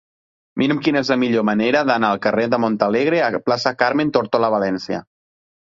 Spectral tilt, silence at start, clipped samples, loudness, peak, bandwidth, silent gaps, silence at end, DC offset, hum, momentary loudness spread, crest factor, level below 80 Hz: -6 dB/octave; 0.55 s; under 0.1%; -18 LUFS; -2 dBFS; 7.6 kHz; none; 0.75 s; under 0.1%; none; 5 LU; 16 dB; -58 dBFS